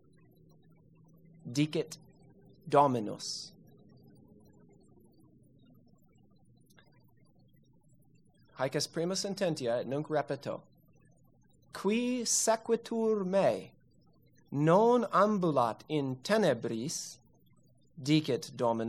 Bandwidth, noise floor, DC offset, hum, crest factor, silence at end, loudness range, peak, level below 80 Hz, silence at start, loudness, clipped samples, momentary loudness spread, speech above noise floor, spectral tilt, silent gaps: 15 kHz; -66 dBFS; under 0.1%; none; 22 dB; 0 s; 8 LU; -12 dBFS; -76 dBFS; 1.45 s; -31 LUFS; under 0.1%; 14 LU; 36 dB; -4.5 dB/octave; none